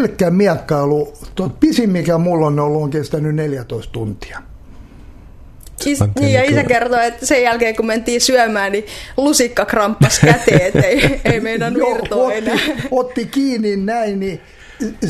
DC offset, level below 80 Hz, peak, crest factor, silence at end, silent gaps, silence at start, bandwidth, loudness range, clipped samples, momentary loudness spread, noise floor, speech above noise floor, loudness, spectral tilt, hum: under 0.1%; -38 dBFS; 0 dBFS; 16 dB; 0 s; none; 0 s; 14 kHz; 7 LU; under 0.1%; 12 LU; -37 dBFS; 22 dB; -15 LUFS; -5 dB/octave; none